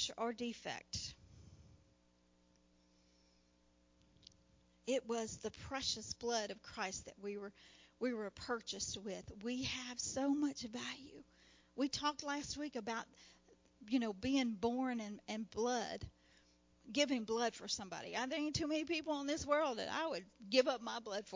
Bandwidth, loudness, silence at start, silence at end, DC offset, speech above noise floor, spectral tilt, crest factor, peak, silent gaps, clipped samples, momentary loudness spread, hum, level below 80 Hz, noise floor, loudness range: 7.6 kHz; -41 LUFS; 0 s; 0 s; under 0.1%; 32 dB; -3 dB/octave; 24 dB; -20 dBFS; none; under 0.1%; 11 LU; none; -68 dBFS; -73 dBFS; 8 LU